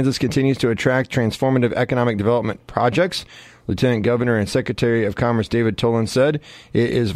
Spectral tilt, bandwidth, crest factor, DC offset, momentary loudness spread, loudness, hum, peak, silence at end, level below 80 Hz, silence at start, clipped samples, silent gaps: -6.5 dB/octave; 14.5 kHz; 18 dB; under 0.1%; 5 LU; -19 LUFS; none; -2 dBFS; 0 s; -46 dBFS; 0 s; under 0.1%; none